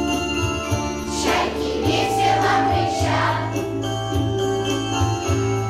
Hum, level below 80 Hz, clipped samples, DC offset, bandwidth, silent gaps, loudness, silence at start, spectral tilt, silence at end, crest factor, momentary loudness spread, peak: none; -38 dBFS; under 0.1%; under 0.1%; 15.5 kHz; none; -21 LUFS; 0 s; -5 dB/octave; 0 s; 12 dB; 6 LU; -10 dBFS